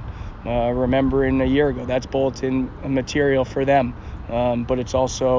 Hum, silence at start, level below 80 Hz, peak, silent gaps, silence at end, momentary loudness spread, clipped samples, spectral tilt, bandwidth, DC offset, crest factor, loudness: none; 0 s; -34 dBFS; -6 dBFS; none; 0 s; 7 LU; under 0.1%; -6.5 dB/octave; 7.6 kHz; under 0.1%; 16 dB; -21 LUFS